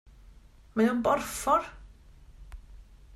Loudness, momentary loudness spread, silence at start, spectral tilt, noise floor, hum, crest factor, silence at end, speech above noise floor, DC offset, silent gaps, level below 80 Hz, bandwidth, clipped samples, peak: -27 LUFS; 17 LU; 0.75 s; -4.5 dB/octave; -54 dBFS; none; 20 dB; 0 s; 27 dB; under 0.1%; none; -50 dBFS; 15.5 kHz; under 0.1%; -12 dBFS